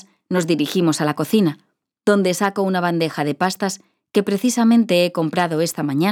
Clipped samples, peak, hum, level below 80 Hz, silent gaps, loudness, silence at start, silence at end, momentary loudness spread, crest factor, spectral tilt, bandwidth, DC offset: under 0.1%; -4 dBFS; none; -72 dBFS; none; -19 LUFS; 0.3 s; 0 s; 8 LU; 16 dB; -5 dB/octave; 18.5 kHz; under 0.1%